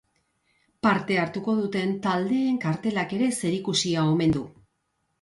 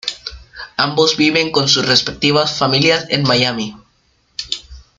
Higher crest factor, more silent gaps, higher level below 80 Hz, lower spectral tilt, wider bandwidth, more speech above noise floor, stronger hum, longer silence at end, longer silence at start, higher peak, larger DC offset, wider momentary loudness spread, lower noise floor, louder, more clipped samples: about the same, 16 dB vs 16 dB; neither; second, -58 dBFS vs -46 dBFS; first, -5 dB/octave vs -3.5 dB/octave; about the same, 11.5 kHz vs 12 kHz; first, 51 dB vs 44 dB; neither; first, 0.7 s vs 0.2 s; first, 0.85 s vs 0.05 s; second, -10 dBFS vs 0 dBFS; neither; second, 5 LU vs 16 LU; first, -75 dBFS vs -58 dBFS; second, -25 LUFS vs -14 LUFS; neither